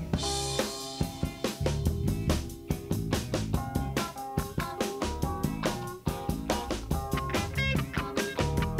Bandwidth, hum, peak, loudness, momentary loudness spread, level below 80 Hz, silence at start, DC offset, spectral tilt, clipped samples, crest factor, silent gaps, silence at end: 16 kHz; none; -14 dBFS; -32 LUFS; 5 LU; -40 dBFS; 0 s; under 0.1%; -5 dB/octave; under 0.1%; 18 dB; none; 0 s